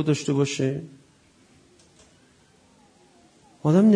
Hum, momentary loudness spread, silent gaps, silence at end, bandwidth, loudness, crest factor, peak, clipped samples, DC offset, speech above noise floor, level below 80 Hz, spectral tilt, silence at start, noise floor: none; 14 LU; none; 0 s; 10.5 kHz; -24 LUFS; 18 dB; -8 dBFS; under 0.1%; under 0.1%; 37 dB; -68 dBFS; -6.5 dB/octave; 0 s; -58 dBFS